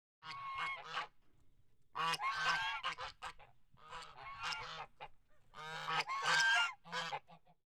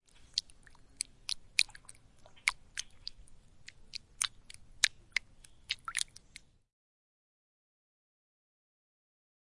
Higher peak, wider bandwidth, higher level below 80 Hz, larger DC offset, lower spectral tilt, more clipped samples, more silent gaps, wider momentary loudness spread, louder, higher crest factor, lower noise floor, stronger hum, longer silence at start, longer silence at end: second, -20 dBFS vs -6 dBFS; first, 18 kHz vs 11.5 kHz; second, -70 dBFS vs -64 dBFS; neither; first, -0.5 dB/octave vs 2.5 dB/octave; neither; neither; second, 20 LU vs 24 LU; about the same, -38 LUFS vs -36 LUFS; second, 22 dB vs 36 dB; first, -70 dBFS vs -59 dBFS; neither; second, 0.2 s vs 0.35 s; second, 0.3 s vs 3.45 s